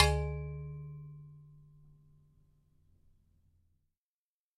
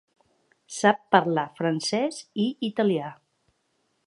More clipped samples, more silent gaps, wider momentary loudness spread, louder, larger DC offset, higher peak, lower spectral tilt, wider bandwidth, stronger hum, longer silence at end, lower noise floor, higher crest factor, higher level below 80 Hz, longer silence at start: neither; neither; first, 24 LU vs 8 LU; second, -37 LUFS vs -25 LUFS; neither; second, -10 dBFS vs -2 dBFS; about the same, -4.5 dB/octave vs -5 dB/octave; about the same, 11.5 kHz vs 11.5 kHz; neither; first, 2.95 s vs 0.95 s; first, under -90 dBFS vs -72 dBFS; first, 30 dB vs 24 dB; first, -46 dBFS vs -76 dBFS; second, 0 s vs 0.7 s